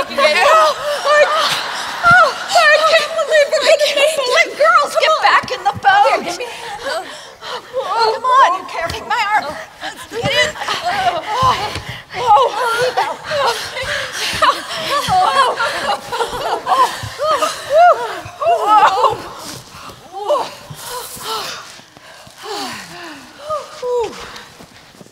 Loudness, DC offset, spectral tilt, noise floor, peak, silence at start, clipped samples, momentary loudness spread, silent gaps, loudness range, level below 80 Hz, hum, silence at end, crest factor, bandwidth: -14 LUFS; under 0.1%; -2 dB/octave; -40 dBFS; 0 dBFS; 0 s; under 0.1%; 17 LU; none; 13 LU; -48 dBFS; none; 0.45 s; 14 dB; 16 kHz